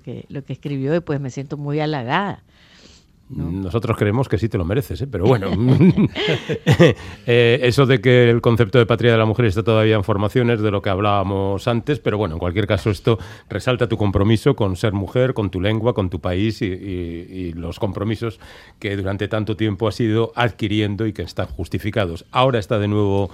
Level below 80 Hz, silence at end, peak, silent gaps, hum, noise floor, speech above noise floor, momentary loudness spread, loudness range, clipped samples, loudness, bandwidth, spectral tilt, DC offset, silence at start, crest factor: -44 dBFS; 0 s; 0 dBFS; none; none; -49 dBFS; 30 dB; 12 LU; 9 LU; under 0.1%; -19 LUFS; 14 kHz; -7.5 dB/octave; under 0.1%; 0.05 s; 18 dB